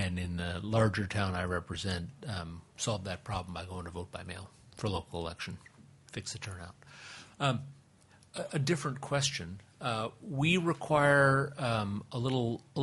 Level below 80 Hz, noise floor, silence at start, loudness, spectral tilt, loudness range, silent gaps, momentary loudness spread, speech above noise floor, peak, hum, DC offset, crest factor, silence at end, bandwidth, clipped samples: -60 dBFS; -62 dBFS; 0 s; -33 LUFS; -5 dB/octave; 11 LU; none; 17 LU; 29 dB; -12 dBFS; none; under 0.1%; 22 dB; 0 s; 11.5 kHz; under 0.1%